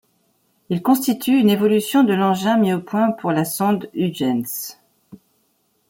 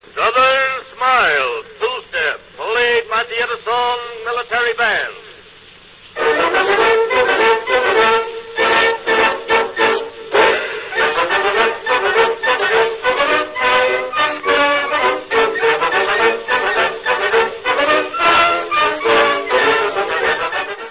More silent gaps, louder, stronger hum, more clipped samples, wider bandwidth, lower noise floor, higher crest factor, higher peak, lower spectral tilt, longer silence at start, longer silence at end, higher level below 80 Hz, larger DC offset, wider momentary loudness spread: neither; second, -19 LUFS vs -15 LUFS; neither; neither; first, 17 kHz vs 4 kHz; first, -65 dBFS vs -42 dBFS; about the same, 16 dB vs 16 dB; second, -4 dBFS vs 0 dBFS; about the same, -5.5 dB/octave vs -6 dB/octave; first, 0.7 s vs 0.15 s; first, 1.15 s vs 0 s; second, -66 dBFS vs -52 dBFS; neither; about the same, 8 LU vs 7 LU